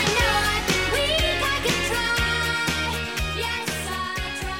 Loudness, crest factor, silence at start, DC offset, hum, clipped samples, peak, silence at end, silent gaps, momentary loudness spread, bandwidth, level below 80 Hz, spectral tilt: -23 LUFS; 16 dB; 0 s; 0.2%; none; under 0.1%; -6 dBFS; 0 s; none; 7 LU; 17 kHz; -34 dBFS; -3 dB/octave